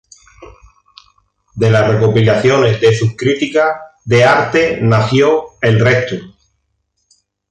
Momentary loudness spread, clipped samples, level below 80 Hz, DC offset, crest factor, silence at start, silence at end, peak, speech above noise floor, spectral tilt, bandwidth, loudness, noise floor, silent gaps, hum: 6 LU; under 0.1%; -44 dBFS; under 0.1%; 14 dB; 0.4 s; 1.2 s; 0 dBFS; 55 dB; -6.5 dB/octave; 9 kHz; -12 LUFS; -67 dBFS; none; 50 Hz at -45 dBFS